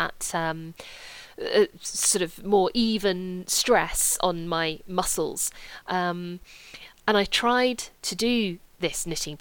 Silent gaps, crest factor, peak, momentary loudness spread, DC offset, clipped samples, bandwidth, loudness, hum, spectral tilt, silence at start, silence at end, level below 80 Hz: none; 18 dB; -8 dBFS; 19 LU; under 0.1%; under 0.1%; 19 kHz; -25 LUFS; none; -2.5 dB/octave; 0 s; 0.05 s; -48 dBFS